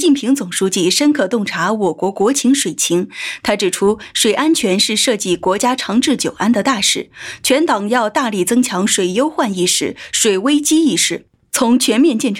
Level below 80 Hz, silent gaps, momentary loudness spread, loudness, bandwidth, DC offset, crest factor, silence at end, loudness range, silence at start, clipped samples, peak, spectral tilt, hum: -56 dBFS; none; 5 LU; -15 LUFS; 17 kHz; under 0.1%; 14 dB; 0 s; 1 LU; 0 s; under 0.1%; -2 dBFS; -3 dB/octave; none